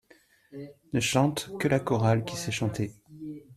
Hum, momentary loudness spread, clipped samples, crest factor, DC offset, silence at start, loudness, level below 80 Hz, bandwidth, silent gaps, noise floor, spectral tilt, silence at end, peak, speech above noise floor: none; 20 LU; under 0.1%; 20 dB; under 0.1%; 0.5 s; -28 LUFS; -60 dBFS; 14.5 kHz; none; -61 dBFS; -5.5 dB/octave; 0 s; -10 dBFS; 33 dB